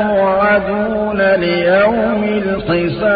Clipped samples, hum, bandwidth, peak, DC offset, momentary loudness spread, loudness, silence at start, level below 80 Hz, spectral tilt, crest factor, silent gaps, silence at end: under 0.1%; none; 5 kHz; -2 dBFS; under 0.1%; 5 LU; -14 LUFS; 0 s; -40 dBFS; -11.5 dB/octave; 12 dB; none; 0 s